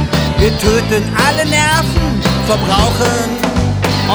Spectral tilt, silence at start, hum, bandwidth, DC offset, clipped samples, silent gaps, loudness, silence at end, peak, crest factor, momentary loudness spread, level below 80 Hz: -4.5 dB/octave; 0 s; none; over 20 kHz; under 0.1%; under 0.1%; none; -13 LUFS; 0 s; 0 dBFS; 12 dB; 4 LU; -24 dBFS